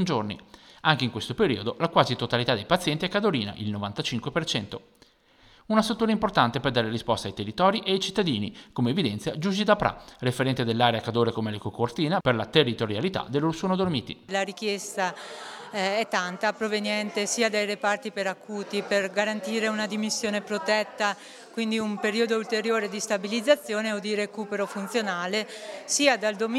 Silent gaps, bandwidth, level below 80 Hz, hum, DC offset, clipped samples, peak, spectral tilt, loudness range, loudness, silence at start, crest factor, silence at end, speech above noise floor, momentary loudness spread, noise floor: none; 15.5 kHz; -58 dBFS; none; under 0.1%; under 0.1%; -4 dBFS; -4.5 dB/octave; 3 LU; -26 LUFS; 0 s; 22 dB; 0 s; 32 dB; 8 LU; -58 dBFS